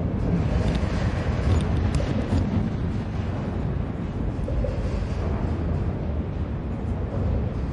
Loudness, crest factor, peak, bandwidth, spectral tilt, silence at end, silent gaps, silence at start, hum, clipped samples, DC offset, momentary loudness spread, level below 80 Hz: -26 LUFS; 14 dB; -10 dBFS; 10.5 kHz; -8 dB/octave; 0 s; none; 0 s; none; under 0.1%; under 0.1%; 5 LU; -30 dBFS